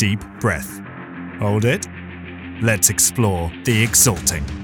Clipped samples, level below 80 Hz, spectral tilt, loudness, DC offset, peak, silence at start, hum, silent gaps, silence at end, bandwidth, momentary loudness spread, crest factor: under 0.1%; -38 dBFS; -3.5 dB/octave; -17 LUFS; under 0.1%; 0 dBFS; 0 s; none; none; 0 s; 19.5 kHz; 20 LU; 20 dB